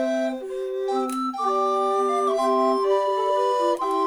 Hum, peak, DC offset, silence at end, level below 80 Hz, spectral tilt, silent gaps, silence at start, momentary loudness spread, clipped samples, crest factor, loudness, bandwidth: none; -10 dBFS; under 0.1%; 0 s; -66 dBFS; -3 dB/octave; none; 0 s; 6 LU; under 0.1%; 12 dB; -23 LUFS; 14 kHz